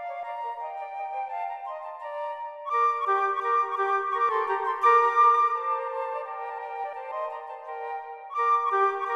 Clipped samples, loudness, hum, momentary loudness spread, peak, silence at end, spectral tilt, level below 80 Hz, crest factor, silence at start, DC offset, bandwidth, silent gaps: under 0.1%; -26 LUFS; none; 16 LU; -10 dBFS; 0 s; -2 dB/octave; -82 dBFS; 18 dB; 0 s; under 0.1%; 7.6 kHz; none